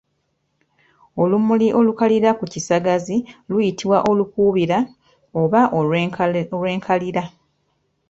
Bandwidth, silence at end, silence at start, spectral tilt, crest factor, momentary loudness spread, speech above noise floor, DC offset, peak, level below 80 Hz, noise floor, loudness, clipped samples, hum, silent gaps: 8 kHz; 0.8 s; 1.15 s; -6.5 dB/octave; 16 dB; 8 LU; 52 dB; under 0.1%; -2 dBFS; -56 dBFS; -70 dBFS; -19 LUFS; under 0.1%; none; none